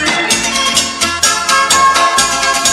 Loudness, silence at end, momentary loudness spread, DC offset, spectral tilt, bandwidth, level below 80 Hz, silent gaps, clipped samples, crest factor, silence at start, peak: -10 LUFS; 0 s; 3 LU; under 0.1%; 0 dB/octave; 16.5 kHz; -42 dBFS; none; under 0.1%; 12 dB; 0 s; 0 dBFS